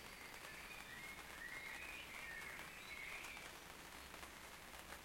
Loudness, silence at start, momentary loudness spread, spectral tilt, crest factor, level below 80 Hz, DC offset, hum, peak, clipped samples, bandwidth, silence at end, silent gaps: -52 LUFS; 0 s; 5 LU; -2 dB/octave; 20 dB; -68 dBFS; under 0.1%; none; -34 dBFS; under 0.1%; 16.5 kHz; 0 s; none